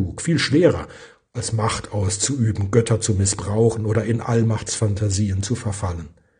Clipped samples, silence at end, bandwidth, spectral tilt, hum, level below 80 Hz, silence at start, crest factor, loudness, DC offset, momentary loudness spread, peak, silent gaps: under 0.1%; 0.3 s; 10 kHz; -5 dB/octave; none; -48 dBFS; 0 s; 18 dB; -21 LUFS; under 0.1%; 9 LU; -2 dBFS; none